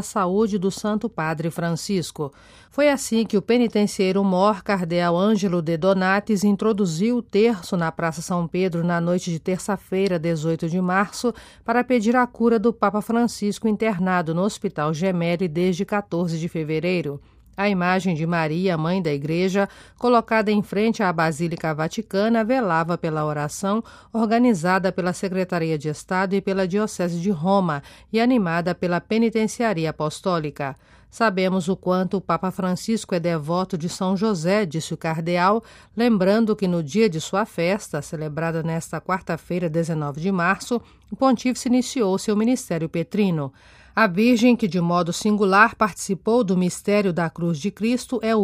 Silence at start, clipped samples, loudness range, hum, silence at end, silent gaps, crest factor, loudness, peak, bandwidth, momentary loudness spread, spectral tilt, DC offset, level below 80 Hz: 0 s; under 0.1%; 3 LU; none; 0 s; none; 20 dB; -22 LUFS; -2 dBFS; 15.5 kHz; 7 LU; -6 dB/octave; under 0.1%; -56 dBFS